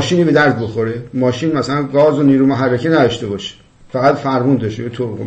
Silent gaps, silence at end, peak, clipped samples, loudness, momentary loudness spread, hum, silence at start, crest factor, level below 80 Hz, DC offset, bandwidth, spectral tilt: none; 0 s; 0 dBFS; under 0.1%; -15 LUFS; 11 LU; none; 0 s; 14 dB; -50 dBFS; under 0.1%; 8.6 kHz; -6.5 dB/octave